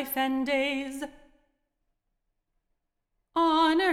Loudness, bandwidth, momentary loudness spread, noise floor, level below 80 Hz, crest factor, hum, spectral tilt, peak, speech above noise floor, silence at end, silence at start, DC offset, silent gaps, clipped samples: -27 LUFS; 16.5 kHz; 15 LU; -79 dBFS; -62 dBFS; 14 dB; none; -2.5 dB/octave; -14 dBFS; 53 dB; 0 s; 0 s; under 0.1%; none; under 0.1%